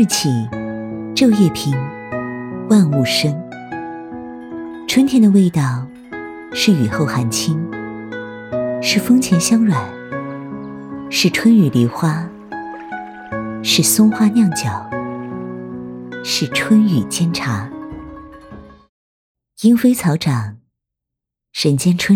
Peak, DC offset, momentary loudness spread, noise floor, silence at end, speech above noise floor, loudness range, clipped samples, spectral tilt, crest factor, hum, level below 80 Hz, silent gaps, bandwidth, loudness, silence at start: -2 dBFS; under 0.1%; 17 LU; -82 dBFS; 0 s; 68 dB; 4 LU; under 0.1%; -5 dB/octave; 16 dB; none; -52 dBFS; 18.89-19.35 s; 16.5 kHz; -16 LUFS; 0 s